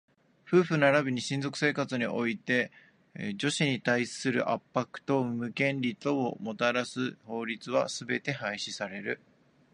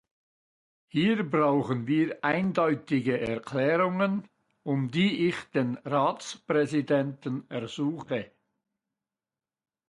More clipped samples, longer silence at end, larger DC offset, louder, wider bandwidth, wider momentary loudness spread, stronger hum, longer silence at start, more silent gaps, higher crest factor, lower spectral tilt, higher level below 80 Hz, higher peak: neither; second, 0.55 s vs 1.65 s; neither; about the same, -30 LUFS vs -28 LUFS; about the same, 11 kHz vs 11.5 kHz; about the same, 9 LU vs 9 LU; neither; second, 0.45 s vs 0.95 s; neither; about the same, 22 dB vs 18 dB; second, -5 dB/octave vs -6.5 dB/octave; second, -74 dBFS vs -68 dBFS; about the same, -10 dBFS vs -12 dBFS